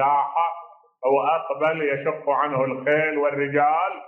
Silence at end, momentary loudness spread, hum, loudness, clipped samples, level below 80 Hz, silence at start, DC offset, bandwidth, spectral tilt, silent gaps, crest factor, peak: 0 s; 5 LU; none; -22 LUFS; under 0.1%; -76 dBFS; 0 s; under 0.1%; 3.7 kHz; -8 dB/octave; none; 14 dB; -8 dBFS